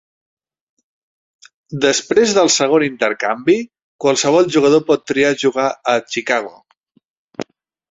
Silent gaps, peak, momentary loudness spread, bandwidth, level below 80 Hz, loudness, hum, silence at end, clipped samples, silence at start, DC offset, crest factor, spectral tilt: 3.82-3.99 s, 6.80-6.84 s, 7.05-7.29 s; -2 dBFS; 19 LU; 8.2 kHz; -60 dBFS; -15 LUFS; none; 0.5 s; under 0.1%; 1.7 s; under 0.1%; 16 dB; -3.5 dB/octave